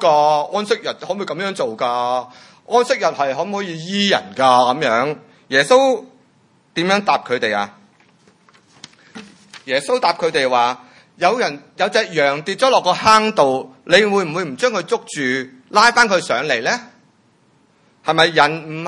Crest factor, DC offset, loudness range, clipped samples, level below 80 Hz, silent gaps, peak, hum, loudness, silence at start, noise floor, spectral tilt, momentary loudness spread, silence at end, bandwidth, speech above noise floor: 18 dB; under 0.1%; 6 LU; under 0.1%; -64 dBFS; none; 0 dBFS; none; -17 LUFS; 0 s; -56 dBFS; -3.5 dB/octave; 11 LU; 0 s; 12 kHz; 40 dB